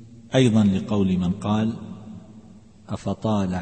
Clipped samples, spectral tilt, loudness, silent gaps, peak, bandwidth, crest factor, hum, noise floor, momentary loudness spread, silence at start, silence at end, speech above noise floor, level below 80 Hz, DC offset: under 0.1%; -7 dB/octave; -22 LUFS; none; -6 dBFS; 8.8 kHz; 18 dB; none; -48 dBFS; 20 LU; 0 s; 0 s; 27 dB; -52 dBFS; 0.2%